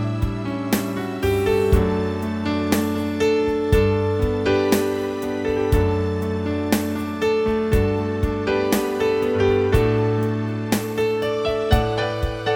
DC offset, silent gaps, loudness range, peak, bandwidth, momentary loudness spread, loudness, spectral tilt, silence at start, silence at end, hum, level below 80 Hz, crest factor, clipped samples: under 0.1%; none; 1 LU; -4 dBFS; 17.5 kHz; 6 LU; -21 LUFS; -6.5 dB/octave; 0 s; 0 s; none; -30 dBFS; 16 dB; under 0.1%